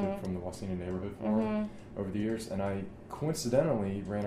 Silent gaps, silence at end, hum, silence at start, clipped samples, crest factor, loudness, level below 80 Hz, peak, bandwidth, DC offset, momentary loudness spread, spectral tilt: none; 0 s; none; 0 s; under 0.1%; 18 dB; -34 LUFS; -56 dBFS; -14 dBFS; 15 kHz; under 0.1%; 9 LU; -6.5 dB/octave